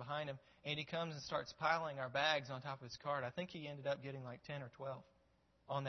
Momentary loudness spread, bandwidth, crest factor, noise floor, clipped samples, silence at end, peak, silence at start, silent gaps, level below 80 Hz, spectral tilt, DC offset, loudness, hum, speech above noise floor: 12 LU; 6.2 kHz; 24 dB; -76 dBFS; under 0.1%; 0 s; -20 dBFS; 0 s; none; -78 dBFS; -2.5 dB/octave; under 0.1%; -43 LUFS; none; 32 dB